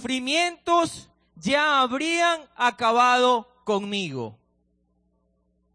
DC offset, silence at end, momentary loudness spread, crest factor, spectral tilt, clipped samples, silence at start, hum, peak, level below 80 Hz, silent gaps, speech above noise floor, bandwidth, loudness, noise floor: under 0.1%; 1.4 s; 13 LU; 16 dB; -3 dB/octave; under 0.1%; 0 s; none; -8 dBFS; -64 dBFS; none; 46 dB; 10.5 kHz; -22 LUFS; -69 dBFS